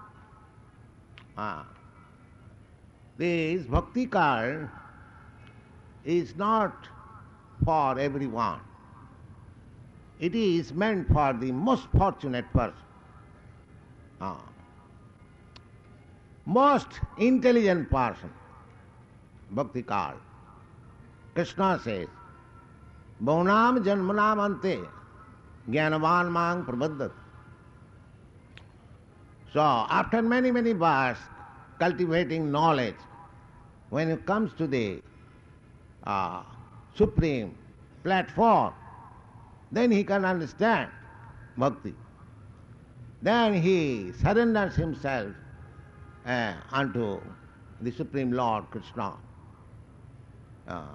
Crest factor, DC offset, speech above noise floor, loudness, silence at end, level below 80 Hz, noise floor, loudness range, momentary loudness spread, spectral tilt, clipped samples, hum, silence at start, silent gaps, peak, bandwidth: 18 dB; under 0.1%; 28 dB; -27 LUFS; 0 s; -46 dBFS; -54 dBFS; 8 LU; 19 LU; -7.5 dB/octave; under 0.1%; none; 0 s; none; -12 dBFS; 10.5 kHz